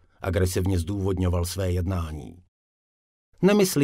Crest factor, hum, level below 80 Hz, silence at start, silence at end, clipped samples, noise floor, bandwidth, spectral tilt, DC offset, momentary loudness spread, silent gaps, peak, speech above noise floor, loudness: 18 dB; none; -46 dBFS; 0.2 s; 0 s; under 0.1%; under -90 dBFS; 16 kHz; -6 dB/octave; under 0.1%; 12 LU; 2.48-3.32 s; -8 dBFS; over 67 dB; -25 LUFS